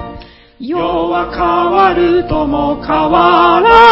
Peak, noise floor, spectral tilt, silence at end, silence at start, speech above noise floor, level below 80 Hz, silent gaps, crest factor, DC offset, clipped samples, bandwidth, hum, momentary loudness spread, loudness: 0 dBFS; -34 dBFS; -7 dB/octave; 0 s; 0 s; 24 dB; -32 dBFS; none; 10 dB; under 0.1%; 0.4%; 8 kHz; none; 10 LU; -11 LUFS